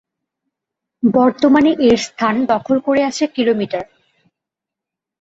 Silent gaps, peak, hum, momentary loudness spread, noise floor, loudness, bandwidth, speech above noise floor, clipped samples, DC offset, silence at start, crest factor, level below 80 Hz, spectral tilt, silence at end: none; -2 dBFS; none; 8 LU; -84 dBFS; -15 LUFS; 8 kHz; 70 dB; under 0.1%; under 0.1%; 1.05 s; 16 dB; -54 dBFS; -5 dB/octave; 1.4 s